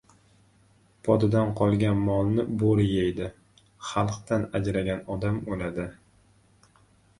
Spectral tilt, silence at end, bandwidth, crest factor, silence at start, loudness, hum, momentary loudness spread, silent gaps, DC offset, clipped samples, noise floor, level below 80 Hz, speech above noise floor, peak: -7.5 dB/octave; 1.3 s; 11.5 kHz; 20 dB; 1.05 s; -26 LUFS; none; 11 LU; none; under 0.1%; under 0.1%; -61 dBFS; -48 dBFS; 36 dB; -8 dBFS